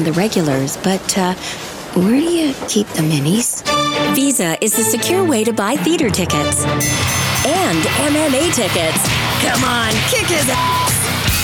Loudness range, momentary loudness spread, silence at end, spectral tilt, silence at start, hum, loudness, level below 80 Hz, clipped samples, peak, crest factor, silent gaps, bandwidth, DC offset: 2 LU; 3 LU; 0 s; -3.5 dB/octave; 0 s; none; -15 LUFS; -38 dBFS; under 0.1%; -2 dBFS; 14 dB; none; 19.5 kHz; under 0.1%